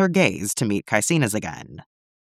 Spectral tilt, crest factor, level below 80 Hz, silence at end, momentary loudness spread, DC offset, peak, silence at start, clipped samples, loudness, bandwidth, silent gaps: -4.5 dB/octave; 20 dB; -58 dBFS; 0.4 s; 16 LU; under 0.1%; -2 dBFS; 0 s; under 0.1%; -21 LUFS; 15.5 kHz; none